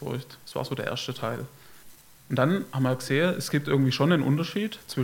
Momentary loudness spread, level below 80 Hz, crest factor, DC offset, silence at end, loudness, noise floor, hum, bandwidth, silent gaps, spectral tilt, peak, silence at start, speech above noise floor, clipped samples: 12 LU; -64 dBFS; 20 dB; under 0.1%; 0 s; -27 LUFS; -52 dBFS; none; 17 kHz; none; -6 dB/octave; -8 dBFS; 0 s; 25 dB; under 0.1%